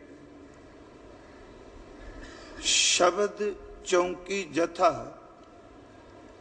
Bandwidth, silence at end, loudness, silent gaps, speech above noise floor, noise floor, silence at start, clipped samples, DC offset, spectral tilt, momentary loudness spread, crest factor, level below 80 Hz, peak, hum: 10.5 kHz; 0.15 s; -26 LUFS; none; 24 dB; -51 dBFS; 0 s; under 0.1%; under 0.1%; -1.5 dB/octave; 26 LU; 20 dB; -54 dBFS; -10 dBFS; none